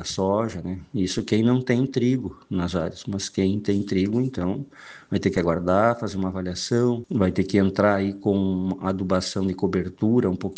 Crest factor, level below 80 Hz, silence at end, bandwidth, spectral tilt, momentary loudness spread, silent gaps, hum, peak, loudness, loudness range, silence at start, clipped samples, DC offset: 18 dB; -56 dBFS; 0 s; 9.4 kHz; -6.5 dB/octave; 8 LU; none; none; -4 dBFS; -24 LUFS; 3 LU; 0 s; under 0.1%; under 0.1%